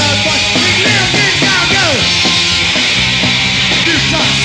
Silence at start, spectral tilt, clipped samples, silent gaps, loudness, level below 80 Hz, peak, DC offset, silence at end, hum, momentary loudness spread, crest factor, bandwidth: 0 s; -2.5 dB/octave; under 0.1%; none; -9 LUFS; -34 dBFS; 0 dBFS; under 0.1%; 0 s; none; 1 LU; 10 dB; 15 kHz